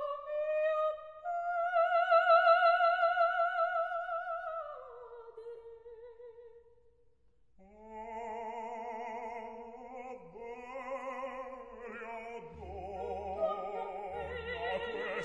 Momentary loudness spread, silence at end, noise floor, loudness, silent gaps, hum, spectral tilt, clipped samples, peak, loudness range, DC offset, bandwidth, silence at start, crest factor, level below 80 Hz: 22 LU; 0 s; -72 dBFS; -33 LUFS; none; none; -5 dB/octave; under 0.1%; -14 dBFS; 19 LU; under 0.1%; 7.6 kHz; 0 s; 20 dB; -64 dBFS